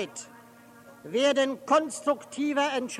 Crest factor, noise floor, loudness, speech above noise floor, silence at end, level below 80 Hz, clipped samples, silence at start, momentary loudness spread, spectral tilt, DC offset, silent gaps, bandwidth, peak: 18 dB; -52 dBFS; -27 LUFS; 25 dB; 0 s; -78 dBFS; under 0.1%; 0 s; 17 LU; -2.5 dB/octave; under 0.1%; none; 14.5 kHz; -10 dBFS